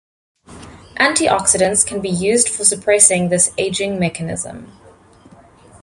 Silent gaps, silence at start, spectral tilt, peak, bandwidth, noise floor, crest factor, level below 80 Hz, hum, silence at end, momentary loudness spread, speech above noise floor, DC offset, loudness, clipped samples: none; 0.5 s; -2.5 dB/octave; 0 dBFS; 16 kHz; -46 dBFS; 18 dB; -48 dBFS; none; 1.2 s; 13 LU; 29 dB; under 0.1%; -14 LUFS; under 0.1%